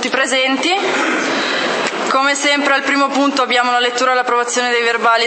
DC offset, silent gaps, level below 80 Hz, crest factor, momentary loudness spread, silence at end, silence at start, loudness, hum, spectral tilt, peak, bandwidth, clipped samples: under 0.1%; none; -74 dBFS; 14 dB; 3 LU; 0 s; 0 s; -14 LUFS; none; -1 dB/octave; 0 dBFS; 8.8 kHz; under 0.1%